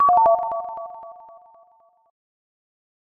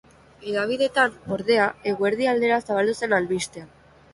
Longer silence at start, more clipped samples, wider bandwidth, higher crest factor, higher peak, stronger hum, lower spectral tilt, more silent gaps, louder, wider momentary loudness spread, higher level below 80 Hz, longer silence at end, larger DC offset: second, 0 s vs 0.4 s; neither; second, 3 kHz vs 11.5 kHz; about the same, 18 dB vs 18 dB; about the same, -6 dBFS vs -6 dBFS; neither; first, -7.5 dB/octave vs -4.5 dB/octave; neither; first, -20 LUFS vs -23 LUFS; first, 24 LU vs 8 LU; about the same, -64 dBFS vs -60 dBFS; first, 1.95 s vs 0.5 s; neither